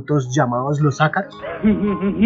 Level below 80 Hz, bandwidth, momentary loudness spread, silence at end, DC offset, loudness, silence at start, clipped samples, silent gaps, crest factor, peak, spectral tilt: -46 dBFS; 7.6 kHz; 4 LU; 0 s; under 0.1%; -19 LUFS; 0 s; under 0.1%; none; 16 dB; -2 dBFS; -7 dB/octave